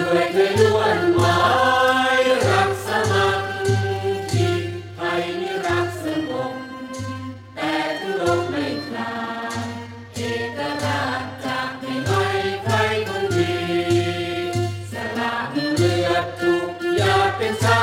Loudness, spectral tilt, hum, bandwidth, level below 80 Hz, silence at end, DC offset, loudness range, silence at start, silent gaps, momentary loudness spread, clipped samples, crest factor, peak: -21 LUFS; -5 dB/octave; none; 16.5 kHz; -52 dBFS; 0 s; under 0.1%; 7 LU; 0 s; none; 11 LU; under 0.1%; 18 dB; -4 dBFS